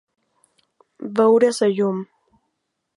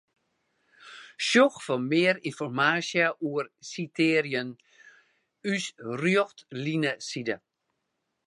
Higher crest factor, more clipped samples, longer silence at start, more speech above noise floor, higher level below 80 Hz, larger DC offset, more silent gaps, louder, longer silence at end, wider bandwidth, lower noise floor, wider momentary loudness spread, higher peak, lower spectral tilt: about the same, 18 dB vs 22 dB; neither; first, 1 s vs 0.85 s; first, 58 dB vs 53 dB; about the same, -74 dBFS vs -78 dBFS; neither; neither; first, -19 LUFS vs -27 LUFS; about the same, 0.95 s vs 0.9 s; about the same, 11.5 kHz vs 11.5 kHz; second, -76 dBFS vs -80 dBFS; first, 19 LU vs 13 LU; first, -4 dBFS vs -8 dBFS; about the same, -5.5 dB/octave vs -4.5 dB/octave